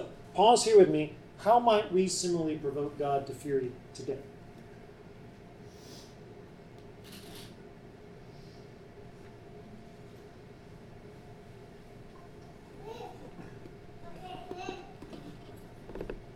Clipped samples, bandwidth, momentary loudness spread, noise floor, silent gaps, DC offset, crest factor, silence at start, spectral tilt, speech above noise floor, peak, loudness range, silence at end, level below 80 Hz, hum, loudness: under 0.1%; 13.5 kHz; 26 LU; -51 dBFS; none; under 0.1%; 22 dB; 0 s; -4.5 dB/octave; 24 dB; -10 dBFS; 23 LU; 0 s; -58 dBFS; none; -28 LUFS